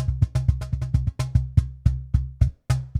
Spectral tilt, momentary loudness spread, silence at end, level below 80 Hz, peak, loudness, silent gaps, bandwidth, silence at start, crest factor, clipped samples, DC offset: -7.5 dB/octave; 4 LU; 0 s; -28 dBFS; -4 dBFS; -25 LUFS; none; 11.5 kHz; 0 s; 18 dB; under 0.1%; under 0.1%